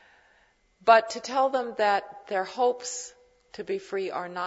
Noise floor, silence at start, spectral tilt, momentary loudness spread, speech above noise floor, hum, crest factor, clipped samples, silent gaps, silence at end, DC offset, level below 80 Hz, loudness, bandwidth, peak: -64 dBFS; 0.85 s; -2.5 dB/octave; 15 LU; 38 dB; none; 22 dB; under 0.1%; none; 0 s; under 0.1%; -72 dBFS; -26 LUFS; 8 kHz; -6 dBFS